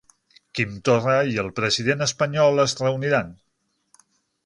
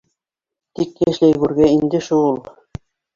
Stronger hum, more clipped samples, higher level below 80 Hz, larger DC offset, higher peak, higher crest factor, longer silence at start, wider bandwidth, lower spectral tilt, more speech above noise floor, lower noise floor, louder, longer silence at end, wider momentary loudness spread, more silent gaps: neither; neither; second, -56 dBFS vs -48 dBFS; neither; second, -6 dBFS vs -2 dBFS; about the same, 18 dB vs 16 dB; second, 0.55 s vs 0.8 s; first, 11 kHz vs 7.4 kHz; second, -4.5 dB/octave vs -7 dB/octave; second, 41 dB vs 71 dB; second, -63 dBFS vs -86 dBFS; second, -21 LUFS vs -17 LUFS; first, 1.15 s vs 0.75 s; second, 8 LU vs 23 LU; neither